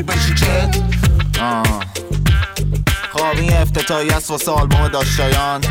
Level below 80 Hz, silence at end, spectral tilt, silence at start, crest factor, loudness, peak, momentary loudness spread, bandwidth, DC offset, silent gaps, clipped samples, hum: -20 dBFS; 0 s; -4.5 dB/octave; 0 s; 10 dB; -16 LUFS; -4 dBFS; 4 LU; 17 kHz; under 0.1%; none; under 0.1%; none